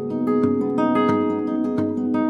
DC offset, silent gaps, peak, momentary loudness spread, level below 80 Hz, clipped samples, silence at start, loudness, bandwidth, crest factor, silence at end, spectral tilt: under 0.1%; none; -8 dBFS; 4 LU; -62 dBFS; under 0.1%; 0 s; -21 LUFS; 6 kHz; 14 dB; 0 s; -8.5 dB/octave